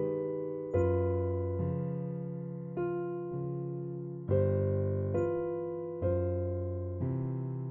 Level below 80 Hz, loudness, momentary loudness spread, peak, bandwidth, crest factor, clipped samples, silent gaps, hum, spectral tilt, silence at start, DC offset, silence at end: -62 dBFS; -34 LUFS; 8 LU; -18 dBFS; 3.2 kHz; 14 dB; under 0.1%; none; none; -12 dB/octave; 0 s; under 0.1%; 0 s